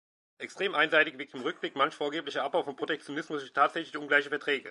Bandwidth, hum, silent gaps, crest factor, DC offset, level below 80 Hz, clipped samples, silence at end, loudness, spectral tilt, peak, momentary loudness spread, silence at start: 11.5 kHz; none; none; 22 dB; under 0.1%; -86 dBFS; under 0.1%; 0 s; -30 LUFS; -3.5 dB/octave; -10 dBFS; 11 LU; 0.4 s